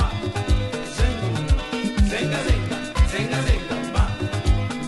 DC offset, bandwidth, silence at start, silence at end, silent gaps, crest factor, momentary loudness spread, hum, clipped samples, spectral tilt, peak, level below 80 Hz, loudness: under 0.1%; 11.5 kHz; 0 s; 0 s; none; 16 dB; 4 LU; none; under 0.1%; -5.5 dB/octave; -6 dBFS; -24 dBFS; -23 LUFS